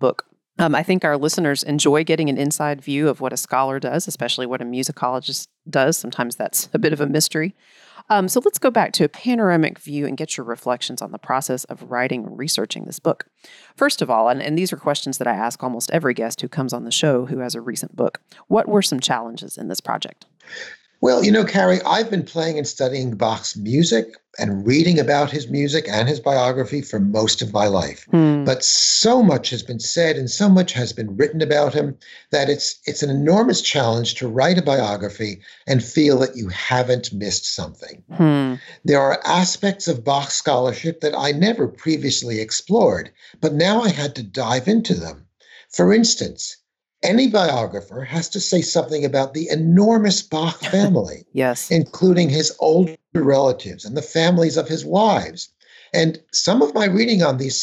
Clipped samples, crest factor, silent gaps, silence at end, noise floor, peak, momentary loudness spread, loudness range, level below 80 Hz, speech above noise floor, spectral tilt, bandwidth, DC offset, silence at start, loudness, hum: under 0.1%; 14 dB; none; 0 s; -49 dBFS; -6 dBFS; 11 LU; 5 LU; -58 dBFS; 30 dB; -4.5 dB/octave; 16 kHz; under 0.1%; 0 s; -19 LUFS; none